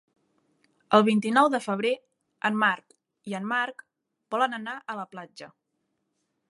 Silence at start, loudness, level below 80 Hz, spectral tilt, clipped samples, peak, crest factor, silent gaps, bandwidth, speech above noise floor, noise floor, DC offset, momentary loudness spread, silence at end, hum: 0.9 s; -26 LUFS; -82 dBFS; -5 dB/octave; under 0.1%; -4 dBFS; 24 dB; none; 11.5 kHz; 53 dB; -78 dBFS; under 0.1%; 18 LU; 1.05 s; none